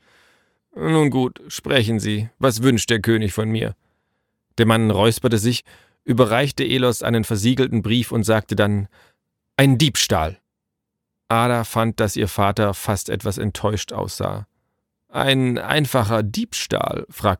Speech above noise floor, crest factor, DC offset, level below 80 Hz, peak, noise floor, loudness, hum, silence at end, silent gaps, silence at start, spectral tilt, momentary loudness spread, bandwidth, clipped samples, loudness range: 61 dB; 18 dB; under 0.1%; -46 dBFS; -2 dBFS; -80 dBFS; -20 LUFS; none; 0.05 s; none; 0.75 s; -5 dB/octave; 9 LU; 18.5 kHz; under 0.1%; 3 LU